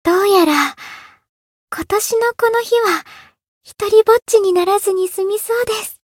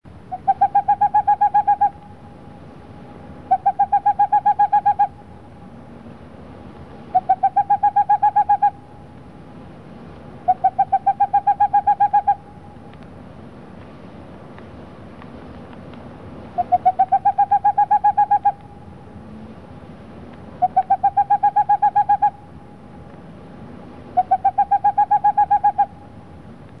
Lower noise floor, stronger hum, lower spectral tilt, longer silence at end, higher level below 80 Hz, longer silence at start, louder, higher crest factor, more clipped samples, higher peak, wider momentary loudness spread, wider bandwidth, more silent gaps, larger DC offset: second, -37 dBFS vs -41 dBFS; neither; second, -2.5 dB/octave vs -8 dB/octave; about the same, 0.15 s vs 0.25 s; about the same, -54 dBFS vs -52 dBFS; second, 0.05 s vs 0.3 s; first, -15 LUFS vs -18 LUFS; about the same, 16 dB vs 14 dB; neither; first, 0 dBFS vs -6 dBFS; second, 11 LU vs 23 LU; first, 17 kHz vs 4.3 kHz; first, 1.29-1.68 s, 3.48-3.61 s vs none; second, under 0.1% vs 0.4%